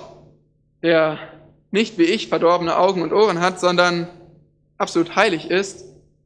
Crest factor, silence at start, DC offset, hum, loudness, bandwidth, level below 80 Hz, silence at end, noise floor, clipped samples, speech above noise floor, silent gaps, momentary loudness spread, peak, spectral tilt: 20 dB; 0 s; under 0.1%; 50 Hz at -55 dBFS; -19 LUFS; 10 kHz; -60 dBFS; 0.4 s; -59 dBFS; under 0.1%; 41 dB; none; 9 LU; 0 dBFS; -4.5 dB/octave